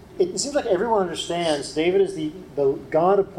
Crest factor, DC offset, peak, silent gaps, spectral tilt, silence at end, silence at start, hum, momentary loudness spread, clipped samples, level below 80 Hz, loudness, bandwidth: 16 dB; under 0.1%; -6 dBFS; none; -4.5 dB/octave; 0 s; 0.05 s; none; 5 LU; under 0.1%; -54 dBFS; -23 LUFS; 12.5 kHz